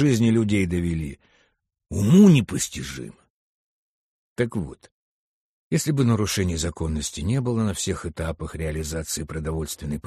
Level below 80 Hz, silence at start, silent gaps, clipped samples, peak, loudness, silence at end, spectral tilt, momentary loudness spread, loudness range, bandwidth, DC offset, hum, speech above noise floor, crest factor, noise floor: -40 dBFS; 0 s; 3.30-4.36 s, 4.91-5.71 s; under 0.1%; -4 dBFS; -23 LUFS; 0.05 s; -6 dB/octave; 15 LU; 7 LU; 13 kHz; under 0.1%; none; 47 dB; 18 dB; -69 dBFS